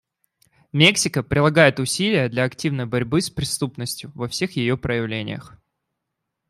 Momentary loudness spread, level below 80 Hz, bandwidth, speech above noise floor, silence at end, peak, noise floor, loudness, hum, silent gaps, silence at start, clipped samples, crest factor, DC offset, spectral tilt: 14 LU; -50 dBFS; 15.5 kHz; 59 dB; 1 s; -2 dBFS; -80 dBFS; -20 LUFS; none; none; 0.75 s; under 0.1%; 20 dB; under 0.1%; -4.5 dB/octave